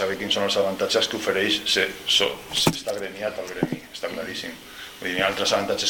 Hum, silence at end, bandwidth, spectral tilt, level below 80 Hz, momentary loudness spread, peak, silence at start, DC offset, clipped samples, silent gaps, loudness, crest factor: none; 0 s; 18 kHz; -2.5 dB/octave; -56 dBFS; 12 LU; -6 dBFS; 0 s; under 0.1%; under 0.1%; none; -23 LUFS; 20 dB